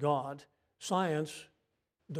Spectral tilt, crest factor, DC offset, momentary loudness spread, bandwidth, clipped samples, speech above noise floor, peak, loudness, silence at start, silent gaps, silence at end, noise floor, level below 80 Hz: -5.5 dB/octave; 20 dB; under 0.1%; 16 LU; 15 kHz; under 0.1%; 47 dB; -18 dBFS; -35 LUFS; 0 s; none; 0 s; -81 dBFS; -78 dBFS